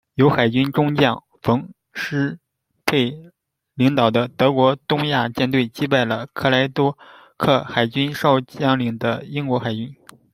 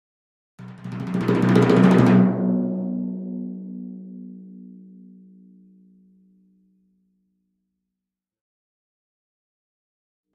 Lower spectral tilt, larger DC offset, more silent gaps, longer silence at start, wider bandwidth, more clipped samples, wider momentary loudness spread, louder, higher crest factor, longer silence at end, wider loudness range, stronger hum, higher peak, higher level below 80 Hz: second, -6.5 dB/octave vs -8.5 dB/octave; neither; neither; second, 0.15 s vs 0.6 s; first, 16 kHz vs 8.6 kHz; neither; second, 9 LU vs 26 LU; about the same, -20 LUFS vs -19 LUFS; about the same, 18 dB vs 22 dB; second, 0.4 s vs 5.6 s; second, 3 LU vs 21 LU; neither; about the same, -2 dBFS vs -2 dBFS; about the same, -56 dBFS vs -60 dBFS